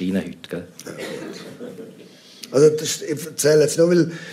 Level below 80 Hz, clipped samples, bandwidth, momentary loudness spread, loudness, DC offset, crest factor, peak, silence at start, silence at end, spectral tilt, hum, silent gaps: -66 dBFS; under 0.1%; 16 kHz; 20 LU; -19 LUFS; under 0.1%; 18 dB; -2 dBFS; 0 s; 0 s; -5 dB/octave; none; none